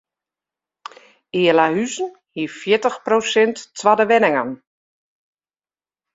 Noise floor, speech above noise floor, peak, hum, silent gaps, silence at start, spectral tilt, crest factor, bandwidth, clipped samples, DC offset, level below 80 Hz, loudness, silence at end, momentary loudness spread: under -90 dBFS; over 73 dB; -2 dBFS; none; none; 1.35 s; -4 dB/octave; 18 dB; 7.8 kHz; under 0.1%; under 0.1%; -66 dBFS; -18 LUFS; 1.6 s; 13 LU